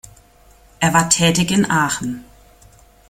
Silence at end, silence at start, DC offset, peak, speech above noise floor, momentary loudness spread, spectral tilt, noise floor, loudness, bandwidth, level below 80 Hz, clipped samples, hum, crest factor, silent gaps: 0.85 s; 0.8 s; under 0.1%; 0 dBFS; 33 dB; 12 LU; -3.5 dB/octave; -49 dBFS; -16 LUFS; 17 kHz; -46 dBFS; under 0.1%; none; 20 dB; none